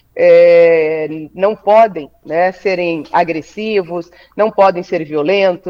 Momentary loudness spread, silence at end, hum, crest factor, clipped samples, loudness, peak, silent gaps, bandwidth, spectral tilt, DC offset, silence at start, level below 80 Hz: 13 LU; 0 s; none; 12 dB; under 0.1%; -13 LUFS; 0 dBFS; none; 7 kHz; -6.5 dB/octave; under 0.1%; 0.15 s; -56 dBFS